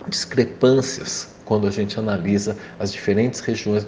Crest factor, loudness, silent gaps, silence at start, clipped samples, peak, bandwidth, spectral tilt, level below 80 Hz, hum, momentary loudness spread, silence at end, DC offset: 18 dB; -21 LUFS; none; 0 s; under 0.1%; -2 dBFS; 10 kHz; -5 dB/octave; -54 dBFS; none; 11 LU; 0 s; under 0.1%